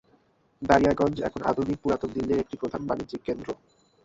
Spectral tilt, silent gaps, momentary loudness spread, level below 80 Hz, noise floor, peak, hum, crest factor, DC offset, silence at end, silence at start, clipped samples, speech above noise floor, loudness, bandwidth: -7 dB/octave; none; 12 LU; -50 dBFS; -64 dBFS; -4 dBFS; none; 24 dB; under 0.1%; 0.5 s; 0.6 s; under 0.1%; 38 dB; -27 LUFS; 8 kHz